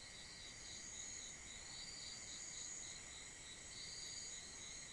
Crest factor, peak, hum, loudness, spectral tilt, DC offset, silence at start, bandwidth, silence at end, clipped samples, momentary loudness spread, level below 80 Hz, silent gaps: 16 dB; -38 dBFS; none; -50 LUFS; 0 dB/octave; under 0.1%; 0 s; 12 kHz; 0 s; under 0.1%; 5 LU; -68 dBFS; none